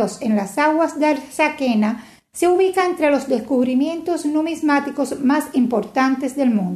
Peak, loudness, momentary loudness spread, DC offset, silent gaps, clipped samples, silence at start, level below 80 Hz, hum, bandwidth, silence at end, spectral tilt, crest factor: -4 dBFS; -19 LUFS; 4 LU; under 0.1%; none; under 0.1%; 0 s; -62 dBFS; none; 13.5 kHz; 0 s; -5.5 dB/octave; 14 dB